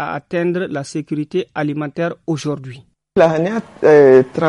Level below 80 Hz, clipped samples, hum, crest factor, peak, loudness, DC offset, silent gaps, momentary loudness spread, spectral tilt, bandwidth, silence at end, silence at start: -56 dBFS; under 0.1%; none; 16 dB; 0 dBFS; -16 LUFS; under 0.1%; none; 14 LU; -7 dB/octave; 11 kHz; 0 s; 0 s